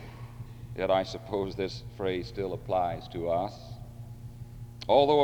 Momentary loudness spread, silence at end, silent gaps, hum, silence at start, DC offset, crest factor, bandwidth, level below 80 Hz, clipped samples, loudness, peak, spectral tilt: 18 LU; 0 s; none; none; 0 s; under 0.1%; 20 dB; over 20 kHz; -52 dBFS; under 0.1%; -30 LUFS; -10 dBFS; -6.5 dB/octave